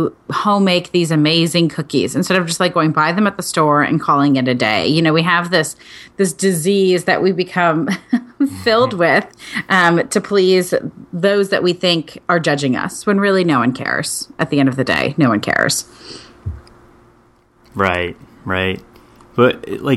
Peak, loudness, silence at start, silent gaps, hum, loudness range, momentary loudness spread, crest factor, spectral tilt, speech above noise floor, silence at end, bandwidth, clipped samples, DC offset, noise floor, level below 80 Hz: 0 dBFS; -15 LUFS; 0 s; none; none; 5 LU; 9 LU; 16 dB; -4.5 dB/octave; 37 dB; 0 s; 13 kHz; under 0.1%; under 0.1%; -52 dBFS; -50 dBFS